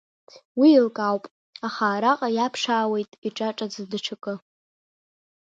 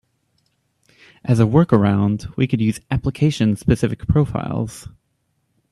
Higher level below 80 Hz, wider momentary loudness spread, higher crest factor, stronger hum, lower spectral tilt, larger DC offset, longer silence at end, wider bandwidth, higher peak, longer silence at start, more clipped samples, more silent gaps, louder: second, -78 dBFS vs -40 dBFS; first, 17 LU vs 10 LU; about the same, 18 dB vs 18 dB; neither; second, -4.5 dB/octave vs -7.5 dB/octave; neither; first, 1.05 s vs 0.85 s; second, 7.8 kHz vs 12.5 kHz; second, -6 dBFS vs 0 dBFS; second, 0.55 s vs 1.25 s; neither; first, 1.31-1.53 s, 3.18-3.22 s vs none; second, -23 LUFS vs -19 LUFS